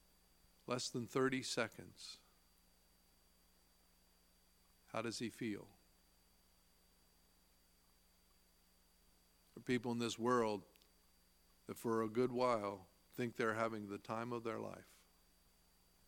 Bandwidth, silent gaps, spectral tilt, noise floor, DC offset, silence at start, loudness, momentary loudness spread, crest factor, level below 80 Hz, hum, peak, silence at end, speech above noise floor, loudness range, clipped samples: 17.5 kHz; none; -4.5 dB/octave; -73 dBFS; under 0.1%; 0.7 s; -42 LUFS; 17 LU; 24 dB; -78 dBFS; 60 Hz at -75 dBFS; -22 dBFS; 1.25 s; 32 dB; 11 LU; under 0.1%